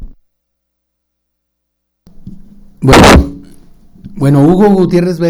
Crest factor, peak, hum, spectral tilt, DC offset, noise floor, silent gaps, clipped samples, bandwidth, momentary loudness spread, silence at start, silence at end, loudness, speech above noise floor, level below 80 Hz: 12 dB; 0 dBFS; 60 Hz at -40 dBFS; -6 dB/octave; under 0.1%; -70 dBFS; none; 1%; over 20 kHz; 12 LU; 0 s; 0 s; -7 LUFS; 63 dB; -22 dBFS